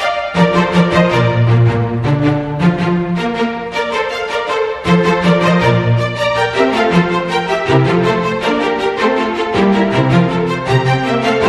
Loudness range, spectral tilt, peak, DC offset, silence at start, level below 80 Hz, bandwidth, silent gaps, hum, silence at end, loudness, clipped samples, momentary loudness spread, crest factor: 2 LU; -7 dB/octave; 0 dBFS; under 0.1%; 0 s; -40 dBFS; 11.5 kHz; none; none; 0 s; -14 LUFS; under 0.1%; 6 LU; 14 dB